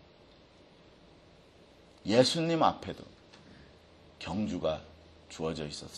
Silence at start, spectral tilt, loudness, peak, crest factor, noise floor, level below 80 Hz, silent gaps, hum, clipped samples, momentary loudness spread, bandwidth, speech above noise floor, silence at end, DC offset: 2.05 s; -5 dB/octave; -31 LUFS; -8 dBFS; 26 dB; -58 dBFS; -60 dBFS; none; none; under 0.1%; 19 LU; 12 kHz; 28 dB; 0 s; under 0.1%